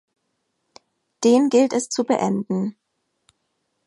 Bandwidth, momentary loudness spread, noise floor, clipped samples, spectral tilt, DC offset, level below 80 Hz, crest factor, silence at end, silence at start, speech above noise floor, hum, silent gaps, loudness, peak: 11.5 kHz; 10 LU; -74 dBFS; under 0.1%; -5 dB/octave; under 0.1%; -72 dBFS; 16 dB; 1.15 s; 1.2 s; 55 dB; none; none; -20 LUFS; -6 dBFS